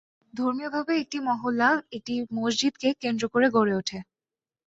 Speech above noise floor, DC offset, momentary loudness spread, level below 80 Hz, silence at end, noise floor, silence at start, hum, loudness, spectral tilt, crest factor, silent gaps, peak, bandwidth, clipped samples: over 64 dB; under 0.1%; 9 LU; -66 dBFS; 0.65 s; under -90 dBFS; 0.35 s; none; -26 LUFS; -4 dB/octave; 18 dB; none; -8 dBFS; 8 kHz; under 0.1%